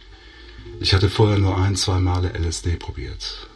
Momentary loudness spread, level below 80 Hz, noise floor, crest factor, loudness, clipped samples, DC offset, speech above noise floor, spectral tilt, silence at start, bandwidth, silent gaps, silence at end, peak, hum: 13 LU; -34 dBFS; -43 dBFS; 18 dB; -21 LUFS; under 0.1%; under 0.1%; 23 dB; -5 dB/octave; 0 s; 11.5 kHz; none; 0.1 s; -4 dBFS; none